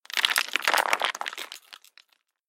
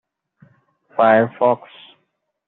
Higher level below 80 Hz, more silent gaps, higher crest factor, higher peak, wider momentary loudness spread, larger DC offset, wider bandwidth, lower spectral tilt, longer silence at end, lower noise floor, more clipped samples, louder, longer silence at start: second, -90 dBFS vs -68 dBFS; neither; first, 26 dB vs 18 dB; about the same, -4 dBFS vs -2 dBFS; first, 16 LU vs 11 LU; neither; first, 17 kHz vs 4.1 kHz; second, 2 dB/octave vs -4.5 dB/octave; second, 0.75 s vs 0.9 s; second, -64 dBFS vs -70 dBFS; neither; second, -25 LUFS vs -17 LUFS; second, 0.1 s vs 1 s